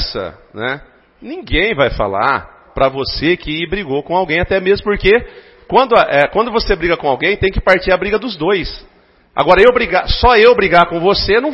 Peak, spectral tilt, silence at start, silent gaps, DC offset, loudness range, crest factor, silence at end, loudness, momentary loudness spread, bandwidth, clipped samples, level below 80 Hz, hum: 0 dBFS; -7 dB/octave; 0 s; none; under 0.1%; 5 LU; 14 dB; 0 s; -13 LUFS; 13 LU; 7 kHz; under 0.1%; -30 dBFS; none